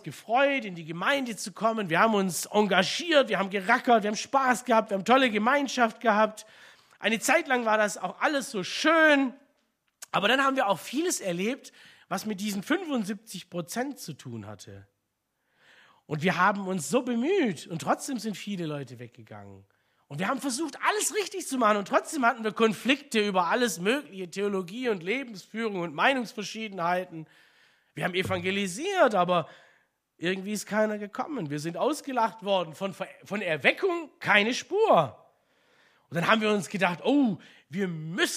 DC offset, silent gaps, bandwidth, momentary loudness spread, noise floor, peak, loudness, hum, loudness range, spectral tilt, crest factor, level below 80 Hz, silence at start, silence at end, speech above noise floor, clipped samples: under 0.1%; none; 15.5 kHz; 12 LU; -79 dBFS; -4 dBFS; -27 LUFS; none; 7 LU; -4 dB/octave; 22 dB; -74 dBFS; 0.05 s; 0 s; 52 dB; under 0.1%